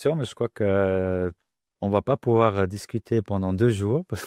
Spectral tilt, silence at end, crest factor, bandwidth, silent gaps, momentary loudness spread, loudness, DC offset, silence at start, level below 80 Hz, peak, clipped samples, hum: -7.5 dB/octave; 0 s; 18 dB; 14.5 kHz; none; 8 LU; -24 LUFS; under 0.1%; 0 s; -56 dBFS; -4 dBFS; under 0.1%; none